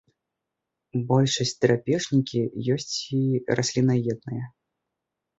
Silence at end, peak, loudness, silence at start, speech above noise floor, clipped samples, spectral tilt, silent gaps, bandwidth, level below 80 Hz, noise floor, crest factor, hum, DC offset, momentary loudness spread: 0.9 s; -6 dBFS; -25 LUFS; 0.95 s; 60 dB; under 0.1%; -5.5 dB/octave; none; 8 kHz; -60 dBFS; -84 dBFS; 20 dB; none; under 0.1%; 10 LU